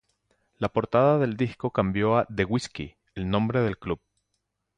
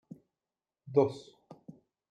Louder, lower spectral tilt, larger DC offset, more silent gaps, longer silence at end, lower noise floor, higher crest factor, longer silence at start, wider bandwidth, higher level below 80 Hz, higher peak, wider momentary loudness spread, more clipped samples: first, -26 LUFS vs -30 LUFS; about the same, -7 dB/octave vs -8 dB/octave; neither; neither; first, 0.8 s vs 0.4 s; second, -79 dBFS vs under -90 dBFS; second, 18 dB vs 24 dB; second, 0.6 s vs 0.85 s; about the same, 10 kHz vs 9.2 kHz; first, -50 dBFS vs -80 dBFS; first, -8 dBFS vs -12 dBFS; second, 13 LU vs 26 LU; neither